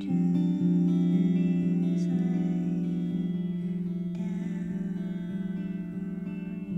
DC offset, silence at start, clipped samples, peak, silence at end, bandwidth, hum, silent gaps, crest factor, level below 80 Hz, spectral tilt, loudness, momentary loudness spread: under 0.1%; 0 s; under 0.1%; -14 dBFS; 0 s; 5.8 kHz; none; none; 14 dB; -60 dBFS; -10 dB/octave; -29 LUFS; 10 LU